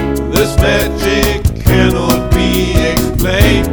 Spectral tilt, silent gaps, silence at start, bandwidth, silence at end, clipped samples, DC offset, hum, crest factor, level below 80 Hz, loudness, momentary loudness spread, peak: -5.5 dB/octave; none; 0 s; over 20 kHz; 0 s; 0.5%; under 0.1%; none; 12 dB; -18 dBFS; -12 LUFS; 3 LU; 0 dBFS